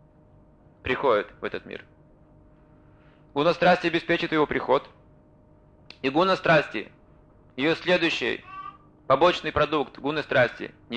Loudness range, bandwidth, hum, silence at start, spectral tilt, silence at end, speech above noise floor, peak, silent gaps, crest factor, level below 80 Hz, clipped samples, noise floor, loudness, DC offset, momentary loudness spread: 3 LU; 9 kHz; none; 0.85 s; -5.5 dB/octave; 0 s; 31 dB; -8 dBFS; none; 18 dB; -54 dBFS; under 0.1%; -55 dBFS; -24 LUFS; under 0.1%; 17 LU